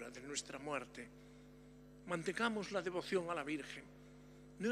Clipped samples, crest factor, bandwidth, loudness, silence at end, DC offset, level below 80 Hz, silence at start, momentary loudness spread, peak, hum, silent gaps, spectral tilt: under 0.1%; 22 dB; 15 kHz; -42 LUFS; 0 s; under 0.1%; -70 dBFS; 0 s; 22 LU; -22 dBFS; 50 Hz at -65 dBFS; none; -4 dB/octave